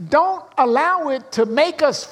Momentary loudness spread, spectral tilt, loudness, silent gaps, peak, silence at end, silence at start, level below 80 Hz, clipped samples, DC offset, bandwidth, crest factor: 4 LU; -4 dB/octave; -18 LUFS; none; -2 dBFS; 0 s; 0 s; -62 dBFS; under 0.1%; under 0.1%; 12.5 kHz; 16 dB